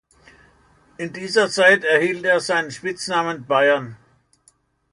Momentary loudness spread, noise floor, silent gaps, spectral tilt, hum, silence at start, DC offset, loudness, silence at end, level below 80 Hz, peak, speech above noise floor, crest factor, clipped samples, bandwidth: 15 LU; -60 dBFS; none; -3.5 dB/octave; none; 1 s; under 0.1%; -18 LUFS; 0.95 s; -64 dBFS; -2 dBFS; 41 dB; 20 dB; under 0.1%; 11 kHz